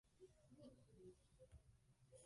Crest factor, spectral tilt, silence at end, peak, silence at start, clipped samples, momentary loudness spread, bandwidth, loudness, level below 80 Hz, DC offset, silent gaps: 16 dB; -6 dB/octave; 0 s; -52 dBFS; 0.05 s; under 0.1%; 3 LU; 11 kHz; -68 LUFS; -78 dBFS; under 0.1%; none